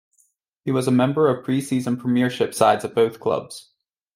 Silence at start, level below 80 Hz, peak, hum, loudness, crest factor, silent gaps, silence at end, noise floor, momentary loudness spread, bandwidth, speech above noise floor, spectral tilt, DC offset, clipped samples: 0.65 s; -66 dBFS; -2 dBFS; none; -21 LUFS; 20 dB; none; 0.55 s; -65 dBFS; 9 LU; 15.5 kHz; 44 dB; -6 dB/octave; under 0.1%; under 0.1%